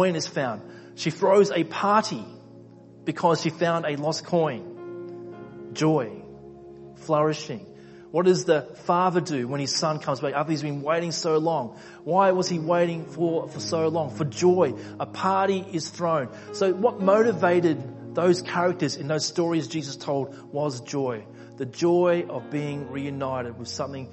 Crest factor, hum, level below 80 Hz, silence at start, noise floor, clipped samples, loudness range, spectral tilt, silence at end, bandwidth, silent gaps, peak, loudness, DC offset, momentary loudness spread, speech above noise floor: 20 dB; none; -64 dBFS; 0 s; -47 dBFS; under 0.1%; 4 LU; -5.5 dB/octave; 0 s; 8.4 kHz; none; -6 dBFS; -25 LUFS; under 0.1%; 16 LU; 23 dB